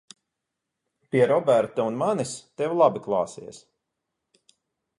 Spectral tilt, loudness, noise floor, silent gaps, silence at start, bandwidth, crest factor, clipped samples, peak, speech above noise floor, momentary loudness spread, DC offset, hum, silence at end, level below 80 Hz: -5.5 dB/octave; -24 LUFS; -83 dBFS; none; 1.15 s; 11.5 kHz; 20 dB; under 0.1%; -6 dBFS; 60 dB; 12 LU; under 0.1%; none; 1.4 s; -70 dBFS